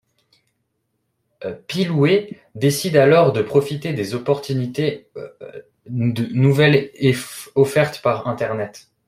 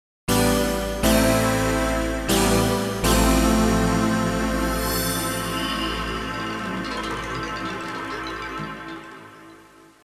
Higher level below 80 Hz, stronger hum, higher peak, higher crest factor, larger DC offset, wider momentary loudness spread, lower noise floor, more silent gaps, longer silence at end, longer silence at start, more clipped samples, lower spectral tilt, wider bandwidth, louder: second, -58 dBFS vs -32 dBFS; neither; first, 0 dBFS vs -6 dBFS; about the same, 18 dB vs 18 dB; neither; first, 18 LU vs 11 LU; first, -72 dBFS vs -49 dBFS; neither; second, 0.3 s vs 0.45 s; first, 1.4 s vs 0.3 s; neither; first, -6 dB/octave vs -4.5 dB/octave; about the same, 16 kHz vs 16 kHz; first, -18 LUFS vs -22 LUFS